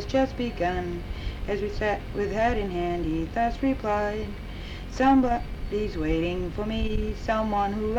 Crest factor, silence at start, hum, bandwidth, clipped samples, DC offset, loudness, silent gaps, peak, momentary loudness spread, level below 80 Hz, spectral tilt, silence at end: 16 dB; 0 s; none; 14 kHz; under 0.1%; under 0.1%; -27 LUFS; none; -10 dBFS; 10 LU; -34 dBFS; -7 dB/octave; 0 s